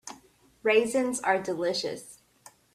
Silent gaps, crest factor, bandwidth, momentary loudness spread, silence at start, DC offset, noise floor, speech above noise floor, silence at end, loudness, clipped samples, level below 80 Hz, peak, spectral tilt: none; 20 dB; 14 kHz; 14 LU; 0.05 s; under 0.1%; -59 dBFS; 32 dB; 0.6 s; -27 LUFS; under 0.1%; -68 dBFS; -10 dBFS; -3 dB/octave